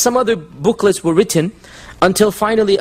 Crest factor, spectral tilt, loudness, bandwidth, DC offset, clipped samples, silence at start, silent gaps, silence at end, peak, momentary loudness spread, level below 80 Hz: 14 dB; -4.5 dB/octave; -15 LUFS; 16 kHz; under 0.1%; under 0.1%; 0 s; none; 0 s; 0 dBFS; 5 LU; -46 dBFS